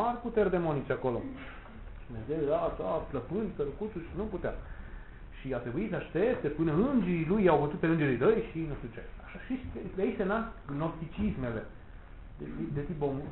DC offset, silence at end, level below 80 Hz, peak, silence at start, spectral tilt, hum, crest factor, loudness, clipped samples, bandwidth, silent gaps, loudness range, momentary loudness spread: under 0.1%; 0 s; -48 dBFS; -12 dBFS; 0 s; -11.5 dB/octave; none; 20 dB; -32 LUFS; under 0.1%; 4.1 kHz; none; 7 LU; 19 LU